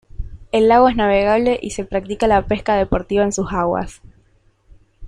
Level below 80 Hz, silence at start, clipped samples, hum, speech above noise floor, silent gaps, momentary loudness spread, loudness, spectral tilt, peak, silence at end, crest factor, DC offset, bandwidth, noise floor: -34 dBFS; 0.2 s; under 0.1%; none; 40 dB; none; 11 LU; -17 LUFS; -5.5 dB/octave; -2 dBFS; 0 s; 16 dB; under 0.1%; 11 kHz; -56 dBFS